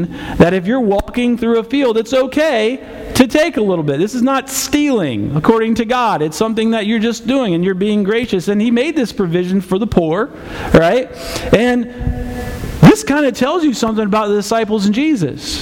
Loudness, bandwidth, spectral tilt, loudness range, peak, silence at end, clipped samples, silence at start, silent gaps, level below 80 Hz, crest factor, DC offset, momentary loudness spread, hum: -14 LUFS; 17 kHz; -5.5 dB/octave; 2 LU; 0 dBFS; 0 s; 0.3%; 0 s; none; -34 dBFS; 14 dB; under 0.1%; 8 LU; none